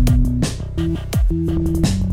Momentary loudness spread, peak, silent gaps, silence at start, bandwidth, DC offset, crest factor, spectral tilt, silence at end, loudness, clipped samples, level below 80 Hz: 5 LU; -4 dBFS; none; 0 s; 16 kHz; under 0.1%; 12 dB; -6.5 dB/octave; 0 s; -20 LUFS; under 0.1%; -20 dBFS